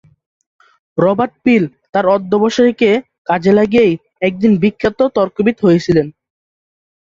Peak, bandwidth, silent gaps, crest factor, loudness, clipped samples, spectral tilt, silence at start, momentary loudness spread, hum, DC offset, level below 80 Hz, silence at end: -2 dBFS; 7.6 kHz; 1.89-1.93 s, 3.18-3.25 s; 14 dB; -14 LUFS; under 0.1%; -7 dB/octave; 0.95 s; 7 LU; none; under 0.1%; -48 dBFS; 0.95 s